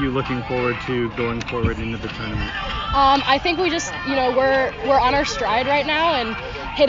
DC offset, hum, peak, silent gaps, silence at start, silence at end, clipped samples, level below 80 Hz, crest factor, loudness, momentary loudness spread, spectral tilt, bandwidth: under 0.1%; none; -4 dBFS; none; 0 s; 0 s; under 0.1%; -36 dBFS; 16 dB; -20 LUFS; 9 LU; -4.5 dB/octave; 7.6 kHz